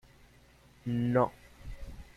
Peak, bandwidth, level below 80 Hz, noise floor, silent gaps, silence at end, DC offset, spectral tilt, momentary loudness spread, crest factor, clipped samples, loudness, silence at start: -14 dBFS; 13.5 kHz; -50 dBFS; -60 dBFS; none; 0.1 s; under 0.1%; -8.5 dB/octave; 22 LU; 20 dB; under 0.1%; -31 LUFS; 0.85 s